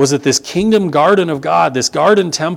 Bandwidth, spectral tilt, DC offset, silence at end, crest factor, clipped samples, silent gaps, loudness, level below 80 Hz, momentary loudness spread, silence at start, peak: 16 kHz; -4 dB/octave; under 0.1%; 0 s; 12 dB; under 0.1%; none; -13 LUFS; -50 dBFS; 3 LU; 0 s; 0 dBFS